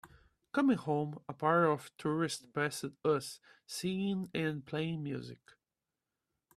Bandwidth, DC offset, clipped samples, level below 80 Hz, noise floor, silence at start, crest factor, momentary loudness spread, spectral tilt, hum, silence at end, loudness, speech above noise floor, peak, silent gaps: 14 kHz; under 0.1%; under 0.1%; -74 dBFS; under -90 dBFS; 0.05 s; 20 dB; 11 LU; -5.5 dB/octave; none; 1.25 s; -35 LUFS; over 55 dB; -16 dBFS; none